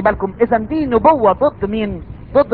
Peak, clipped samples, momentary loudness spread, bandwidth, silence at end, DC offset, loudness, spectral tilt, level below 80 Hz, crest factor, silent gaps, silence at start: 0 dBFS; under 0.1%; 9 LU; 4.8 kHz; 0 s; 0.3%; -16 LUFS; -10 dB/octave; -36 dBFS; 14 dB; none; 0 s